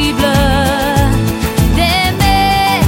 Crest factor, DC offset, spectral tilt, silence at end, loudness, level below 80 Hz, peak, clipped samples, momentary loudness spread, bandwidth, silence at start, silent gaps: 10 dB; under 0.1%; -5 dB/octave; 0 s; -12 LUFS; -20 dBFS; 0 dBFS; under 0.1%; 3 LU; 17 kHz; 0 s; none